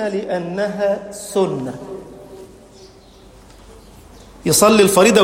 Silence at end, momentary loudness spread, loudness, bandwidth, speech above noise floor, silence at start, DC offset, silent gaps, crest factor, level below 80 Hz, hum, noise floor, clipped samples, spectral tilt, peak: 0 s; 23 LU; -16 LUFS; 16.5 kHz; 28 dB; 0 s; under 0.1%; none; 18 dB; -48 dBFS; none; -44 dBFS; under 0.1%; -4 dB/octave; 0 dBFS